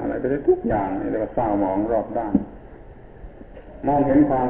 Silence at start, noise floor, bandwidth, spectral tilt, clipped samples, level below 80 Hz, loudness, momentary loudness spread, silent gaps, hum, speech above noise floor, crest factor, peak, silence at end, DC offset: 0 s; -42 dBFS; 3.7 kHz; -12.5 dB/octave; under 0.1%; -42 dBFS; -22 LUFS; 22 LU; none; none; 21 dB; 18 dB; -4 dBFS; 0 s; under 0.1%